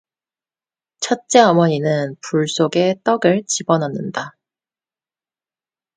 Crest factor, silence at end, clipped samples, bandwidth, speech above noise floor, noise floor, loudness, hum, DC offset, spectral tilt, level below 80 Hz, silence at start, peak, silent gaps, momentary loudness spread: 20 dB; 1.65 s; under 0.1%; 9.6 kHz; over 73 dB; under -90 dBFS; -17 LUFS; none; under 0.1%; -4.5 dB/octave; -66 dBFS; 1 s; 0 dBFS; none; 13 LU